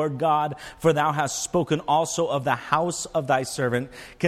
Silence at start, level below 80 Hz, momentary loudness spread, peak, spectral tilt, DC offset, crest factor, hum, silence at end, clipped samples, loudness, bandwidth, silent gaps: 0 s; -56 dBFS; 4 LU; -4 dBFS; -4.5 dB/octave; under 0.1%; 20 dB; none; 0 s; under 0.1%; -24 LUFS; 15.5 kHz; none